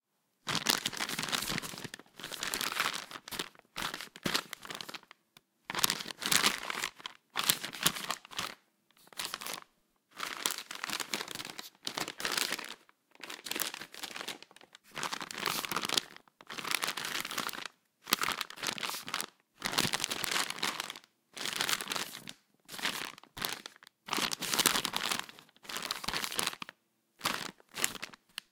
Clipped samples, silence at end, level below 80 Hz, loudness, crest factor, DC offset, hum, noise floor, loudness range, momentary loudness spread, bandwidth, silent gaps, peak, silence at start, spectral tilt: under 0.1%; 0.1 s; -68 dBFS; -34 LUFS; 34 dB; under 0.1%; none; -71 dBFS; 5 LU; 15 LU; 18 kHz; none; -2 dBFS; 0.45 s; -0.5 dB/octave